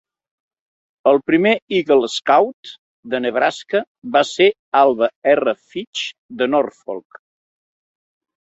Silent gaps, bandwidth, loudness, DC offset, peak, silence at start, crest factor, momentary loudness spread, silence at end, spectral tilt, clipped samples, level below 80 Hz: 1.62-1.67 s, 2.54-2.63 s, 2.78-3.03 s, 3.87-4.02 s, 4.59-4.72 s, 5.16-5.22 s, 5.87-5.93 s, 6.18-6.29 s; 8.2 kHz; -17 LUFS; under 0.1%; -2 dBFS; 1.05 s; 18 dB; 12 LU; 1.45 s; -4.5 dB/octave; under 0.1%; -64 dBFS